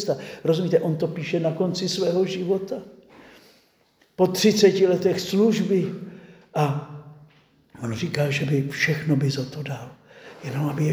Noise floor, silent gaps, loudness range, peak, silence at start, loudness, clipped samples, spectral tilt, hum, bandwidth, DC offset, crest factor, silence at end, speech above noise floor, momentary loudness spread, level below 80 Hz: -62 dBFS; none; 5 LU; -4 dBFS; 0 s; -23 LUFS; under 0.1%; -6 dB/octave; none; over 20 kHz; under 0.1%; 20 dB; 0 s; 40 dB; 16 LU; -64 dBFS